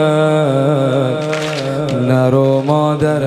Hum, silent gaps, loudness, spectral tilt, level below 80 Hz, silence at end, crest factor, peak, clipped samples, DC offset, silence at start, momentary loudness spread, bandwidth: none; none; -14 LUFS; -7 dB/octave; -50 dBFS; 0 s; 12 dB; 0 dBFS; under 0.1%; under 0.1%; 0 s; 6 LU; 12.5 kHz